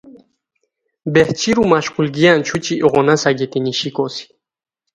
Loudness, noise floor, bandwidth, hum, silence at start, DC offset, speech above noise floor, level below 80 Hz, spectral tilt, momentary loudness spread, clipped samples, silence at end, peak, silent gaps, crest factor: -15 LUFS; -71 dBFS; 11 kHz; none; 0.05 s; under 0.1%; 56 dB; -52 dBFS; -5 dB/octave; 9 LU; under 0.1%; 0.7 s; 0 dBFS; none; 16 dB